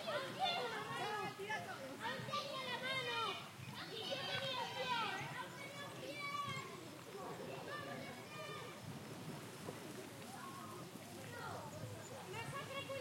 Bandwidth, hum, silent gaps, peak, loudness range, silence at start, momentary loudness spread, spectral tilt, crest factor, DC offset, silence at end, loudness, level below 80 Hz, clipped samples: 16.5 kHz; none; none; -28 dBFS; 8 LU; 0 s; 11 LU; -3.5 dB/octave; 18 dB; under 0.1%; 0 s; -45 LUFS; -84 dBFS; under 0.1%